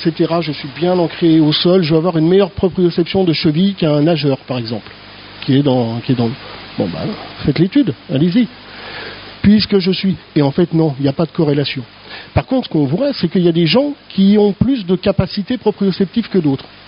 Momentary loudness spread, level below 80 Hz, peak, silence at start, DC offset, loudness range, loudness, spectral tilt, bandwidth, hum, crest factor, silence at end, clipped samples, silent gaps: 13 LU; -42 dBFS; 0 dBFS; 0 s; under 0.1%; 4 LU; -15 LUFS; -6 dB/octave; 5.4 kHz; none; 14 dB; 0.25 s; under 0.1%; none